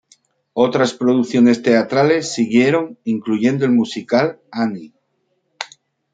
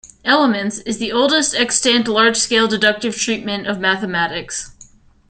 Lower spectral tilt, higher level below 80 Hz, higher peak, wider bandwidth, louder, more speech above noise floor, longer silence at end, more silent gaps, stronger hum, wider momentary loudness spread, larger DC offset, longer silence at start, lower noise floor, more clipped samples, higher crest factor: first, -5.5 dB/octave vs -2 dB/octave; second, -64 dBFS vs -50 dBFS; about the same, -2 dBFS vs 0 dBFS; about the same, 9.2 kHz vs 9.4 kHz; about the same, -17 LUFS vs -16 LUFS; first, 52 dB vs 29 dB; about the same, 0.5 s vs 0.45 s; neither; neither; first, 14 LU vs 9 LU; neither; first, 0.55 s vs 0.05 s; first, -68 dBFS vs -46 dBFS; neither; about the same, 16 dB vs 18 dB